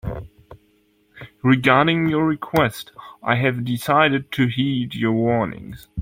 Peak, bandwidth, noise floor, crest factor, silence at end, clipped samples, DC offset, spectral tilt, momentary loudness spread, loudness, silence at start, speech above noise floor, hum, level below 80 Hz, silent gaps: -2 dBFS; 16.5 kHz; -61 dBFS; 20 dB; 0 s; under 0.1%; under 0.1%; -6.5 dB/octave; 17 LU; -19 LUFS; 0.05 s; 41 dB; none; -48 dBFS; none